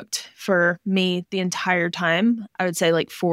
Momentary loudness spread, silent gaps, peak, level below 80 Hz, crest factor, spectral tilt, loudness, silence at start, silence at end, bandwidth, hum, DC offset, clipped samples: 6 LU; none; -6 dBFS; -72 dBFS; 16 dB; -4.5 dB/octave; -22 LUFS; 0 s; 0 s; 16 kHz; none; under 0.1%; under 0.1%